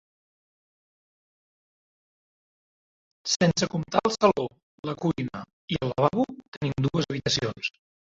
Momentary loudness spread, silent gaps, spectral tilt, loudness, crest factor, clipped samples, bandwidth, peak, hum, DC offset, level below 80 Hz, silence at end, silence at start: 12 LU; 3.36-3.40 s, 4.63-4.83 s, 5.53-5.68 s, 6.48-6.61 s; -5 dB/octave; -27 LUFS; 24 dB; under 0.1%; 8 kHz; -6 dBFS; none; under 0.1%; -56 dBFS; 0.5 s; 3.25 s